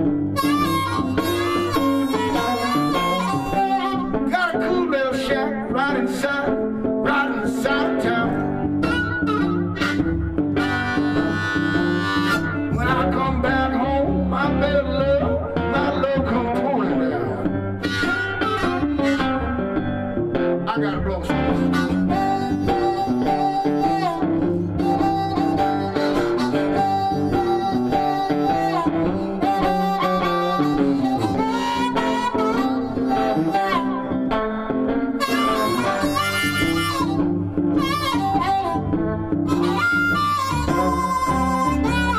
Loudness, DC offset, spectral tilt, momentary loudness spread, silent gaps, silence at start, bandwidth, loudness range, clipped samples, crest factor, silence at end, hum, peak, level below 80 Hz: -21 LUFS; under 0.1%; -6 dB/octave; 3 LU; none; 0 s; 15.5 kHz; 1 LU; under 0.1%; 12 dB; 0 s; none; -8 dBFS; -38 dBFS